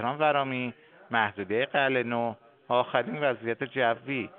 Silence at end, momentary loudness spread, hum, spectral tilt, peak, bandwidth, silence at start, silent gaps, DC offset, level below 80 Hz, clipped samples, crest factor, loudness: 0 s; 7 LU; none; -3 dB/octave; -8 dBFS; 4.4 kHz; 0 s; none; under 0.1%; -78 dBFS; under 0.1%; 20 dB; -28 LUFS